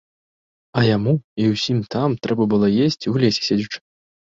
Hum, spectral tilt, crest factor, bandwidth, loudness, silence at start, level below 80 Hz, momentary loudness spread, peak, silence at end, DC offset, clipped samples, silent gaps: none; -6.5 dB/octave; 16 dB; 7.6 kHz; -19 LUFS; 0.75 s; -54 dBFS; 6 LU; -4 dBFS; 0.55 s; under 0.1%; under 0.1%; 1.24-1.36 s